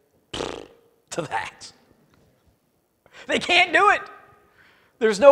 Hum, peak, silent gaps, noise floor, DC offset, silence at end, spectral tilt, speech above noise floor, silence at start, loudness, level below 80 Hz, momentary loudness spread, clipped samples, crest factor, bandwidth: none; 0 dBFS; none; -68 dBFS; under 0.1%; 0 s; -3 dB/octave; 49 dB; 0.35 s; -21 LUFS; -58 dBFS; 26 LU; under 0.1%; 24 dB; 13 kHz